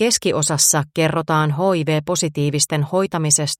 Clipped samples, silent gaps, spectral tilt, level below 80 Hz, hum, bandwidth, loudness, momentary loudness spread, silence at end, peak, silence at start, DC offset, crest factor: under 0.1%; none; -3.5 dB/octave; -56 dBFS; none; 16.5 kHz; -18 LUFS; 5 LU; 0.05 s; -2 dBFS; 0 s; under 0.1%; 16 dB